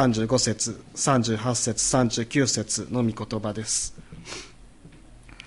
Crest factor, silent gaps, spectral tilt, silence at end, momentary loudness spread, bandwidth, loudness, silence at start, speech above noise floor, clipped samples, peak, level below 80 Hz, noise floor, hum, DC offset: 18 dB; none; -4 dB/octave; 0 s; 15 LU; 11.5 kHz; -24 LUFS; 0 s; 23 dB; under 0.1%; -8 dBFS; -50 dBFS; -48 dBFS; none; under 0.1%